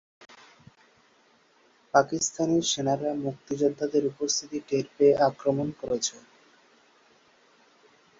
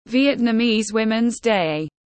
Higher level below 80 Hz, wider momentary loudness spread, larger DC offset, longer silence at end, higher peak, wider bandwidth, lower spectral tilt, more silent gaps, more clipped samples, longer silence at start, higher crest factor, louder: second, -66 dBFS vs -56 dBFS; first, 8 LU vs 4 LU; neither; first, 2 s vs 0.2 s; about the same, -6 dBFS vs -6 dBFS; second, 7.8 kHz vs 8.8 kHz; about the same, -4 dB/octave vs -4.5 dB/octave; neither; neither; first, 1.95 s vs 0.1 s; first, 24 dB vs 14 dB; second, -26 LUFS vs -20 LUFS